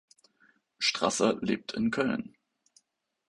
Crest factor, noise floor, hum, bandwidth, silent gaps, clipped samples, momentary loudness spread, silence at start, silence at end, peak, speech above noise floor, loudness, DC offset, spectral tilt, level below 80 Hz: 22 dB; -72 dBFS; none; 11.5 kHz; none; under 0.1%; 7 LU; 0.8 s; 1.05 s; -10 dBFS; 44 dB; -29 LUFS; under 0.1%; -3.5 dB/octave; -66 dBFS